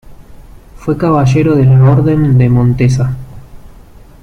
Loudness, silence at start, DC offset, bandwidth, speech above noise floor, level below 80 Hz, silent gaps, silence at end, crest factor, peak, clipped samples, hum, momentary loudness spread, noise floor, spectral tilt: -10 LUFS; 0.05 s; under 0.1%; 6.8 kHz; 28 dB; -32 dBFS; none; 0.55 s; 10 dB; -2 dBFS; under 0.1%; none; 11 LU; -36 dBFS; -9 dB/octave